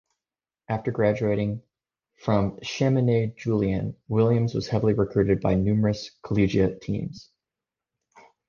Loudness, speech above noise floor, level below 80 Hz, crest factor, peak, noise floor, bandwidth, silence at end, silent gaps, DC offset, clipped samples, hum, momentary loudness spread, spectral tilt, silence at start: -25 LUFS; over 66 dB; -48 dBFS; 18 dB; -8 dBFS; under -90 dBFS; 7.2 kHz; 1.25 s; none; under 0.1%; under 0.1%; none; 9 LU; -8 dB/octave; 0.7 s